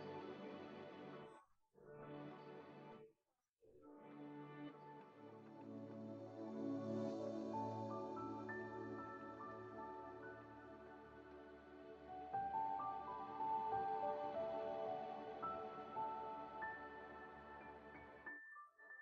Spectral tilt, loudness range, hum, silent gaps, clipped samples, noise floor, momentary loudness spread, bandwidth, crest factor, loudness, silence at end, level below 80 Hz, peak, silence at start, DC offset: -5 dB/octave; 13 LU; none; 3.49-3.53 s; under 0.1%; -90 dBFS; 15 LU; 7.6 kHz; 18 dB; -50 LUFS; 0 s; -80 dBFS; -32 dBFS; 0 s; under 0.1%